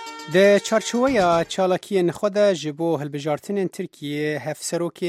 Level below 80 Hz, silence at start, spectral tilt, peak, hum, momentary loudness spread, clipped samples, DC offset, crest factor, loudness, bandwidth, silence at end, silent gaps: -56 dBFS; 0 s; -5 dB/octave; -4 dBFS; none; 10 LU; under 0.1%; under 0.1%; 18 dB; -21 LUFS; 15.5 kHz; 0 s; none